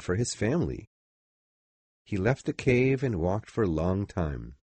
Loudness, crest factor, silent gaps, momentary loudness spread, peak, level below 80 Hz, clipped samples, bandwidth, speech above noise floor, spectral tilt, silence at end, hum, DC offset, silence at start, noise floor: -28 LUFS; 18 dB; 0.87-2.05 s; 10 LU; -12 dBFS; -46 dBFS; under 0.1%; 8.4 kHz; over 62 dB; -6.5 dB/octave; 0.2 s; none; under 0.1%; 0 s; under -90 dBFS